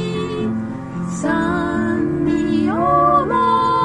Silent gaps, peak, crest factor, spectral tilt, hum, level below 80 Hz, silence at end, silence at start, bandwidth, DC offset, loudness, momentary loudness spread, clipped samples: none; -4 dBFS; 14 dB; -6.5 dB/octave; none; -42 dBFS; 0 s; 0 s; 11 kHz; under 0.1%; -18 LUFS; 10 LU; under 0.1%